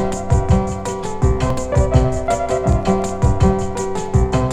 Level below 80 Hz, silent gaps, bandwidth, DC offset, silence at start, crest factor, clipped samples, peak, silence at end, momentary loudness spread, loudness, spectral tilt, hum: -22 dBFS; none; 11 kHz; under 0.1%; 0 s; 16 dB; under 0.1%; 0 dBFS; 0 s; 6 LU; -18 LUFS; -7 dB/octave; none